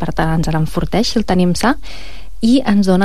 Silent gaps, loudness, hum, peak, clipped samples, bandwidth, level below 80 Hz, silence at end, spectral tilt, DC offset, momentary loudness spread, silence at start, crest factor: none; -16 LUFS; none; -2 dBFS; under 0.1%; 14.5 kHz; -30 dBFS; 0 s; -6 dB/octave; 9%; 15 LU; 0 s; 12 dB